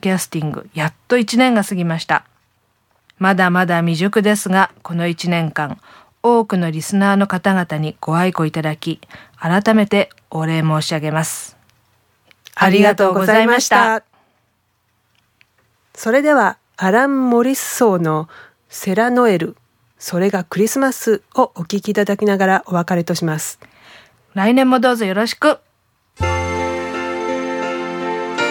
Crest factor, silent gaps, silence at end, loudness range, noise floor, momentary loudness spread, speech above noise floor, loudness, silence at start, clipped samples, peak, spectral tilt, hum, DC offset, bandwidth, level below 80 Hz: 16 dB; none; 0 s; 3 LU; -64 dBFS; 11 LU; 49 dB; -16 LUFS; 0.05 s; under 0.1%; 0 dBFS; -5 dB/octave; none; under 0.1%; 18.5 kHz; -50 dBFS